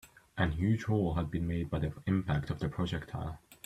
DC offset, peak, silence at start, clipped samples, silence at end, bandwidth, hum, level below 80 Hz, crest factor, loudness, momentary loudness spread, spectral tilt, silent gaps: under 0.1%; -16 dBFS; 0.05 s; under 0.1%; 0.1 s; 14 kHz; none; -48 dBFS; 18 dB; -34 LUFS; 10 LU; -7.5 dB/octave; none